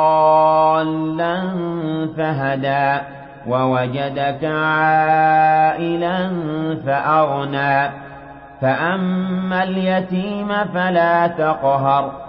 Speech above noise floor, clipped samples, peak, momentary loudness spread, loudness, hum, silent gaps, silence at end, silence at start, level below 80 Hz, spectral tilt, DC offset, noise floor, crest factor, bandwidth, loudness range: 20 dB; under 0.1%; -4 dBFS; 9 LU; -18 LUFS; none; none; 0 s; 0 s; -52 dBFS; -11.5 dB/octave; under 0.1%; -37 dBFS; 14 dB; 5.6 kHz; 4 LU